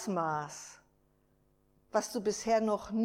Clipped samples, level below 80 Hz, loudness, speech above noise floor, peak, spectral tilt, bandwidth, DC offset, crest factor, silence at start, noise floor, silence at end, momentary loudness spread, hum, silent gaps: under 0.1%; -66 dBFS; -33 LUFS; 38 dB; -16 dBFS; -4.5 dB/octave; 16 kHz; under 0.1%; 18 dB; 0 s; -70 dBFS; 0 s; 15 LU; none; none